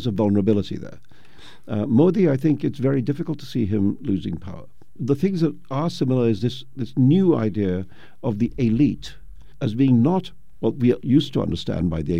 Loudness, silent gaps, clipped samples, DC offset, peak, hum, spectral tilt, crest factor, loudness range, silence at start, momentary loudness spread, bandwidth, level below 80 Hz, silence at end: -22 LUFS; none; under 0.1%; 2%; -6 dBFS; none; -8.5 dB/octave; 16 dB; 3 LU; 0 s; 14 LU; 10.5 kHz; -48 dBFS; 0 s